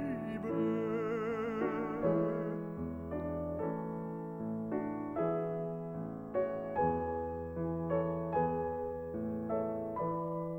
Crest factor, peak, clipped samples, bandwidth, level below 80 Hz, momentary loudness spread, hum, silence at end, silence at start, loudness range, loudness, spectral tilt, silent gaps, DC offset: 16 dB; -20 dBFS; under 0.1%; 7 kHz; -58 dBFS; 7 LU; none; 0 s; 0 s; 2 LU; -37 LUFS; -10 dB/octave; none; under 0.1%